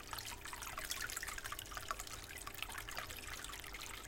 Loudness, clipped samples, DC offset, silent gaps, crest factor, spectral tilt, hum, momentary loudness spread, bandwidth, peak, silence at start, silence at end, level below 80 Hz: -45 LUFS; under 0.1%; under 0.1%; none; 24 dB; -1 dB/octave; none; 5 LU; 17 kHz; -22 dBFS; 0 s; 0 s; -58 dBFS